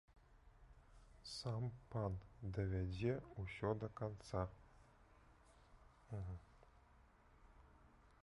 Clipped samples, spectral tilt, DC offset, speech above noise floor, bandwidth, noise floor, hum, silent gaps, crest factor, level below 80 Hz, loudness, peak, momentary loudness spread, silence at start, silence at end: under 0.1%; -7 dB/octave; under 0.1%; 24 dB; 11 kHz; -69 dBFS; none; none; 20 dB; -60 dBFS; -47 LUFS; -28 dBFS; 11 LU; 0.1 s; 0.15 s